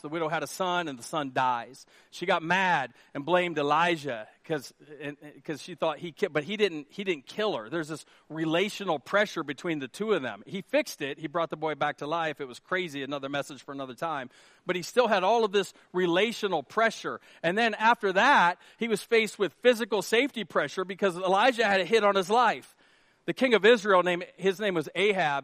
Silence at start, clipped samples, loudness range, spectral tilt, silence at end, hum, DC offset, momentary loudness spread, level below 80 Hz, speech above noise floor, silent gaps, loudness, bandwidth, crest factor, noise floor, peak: 0.05 s; under 0.1%; 7 LU; -4 dB/octave; 0 s; none; under 0.1%; 14 LU; -78 dBFS; 35 dB; none; -27 LUFS; 15 kHz; 20 dB; -63 dBFS; -8 dBFS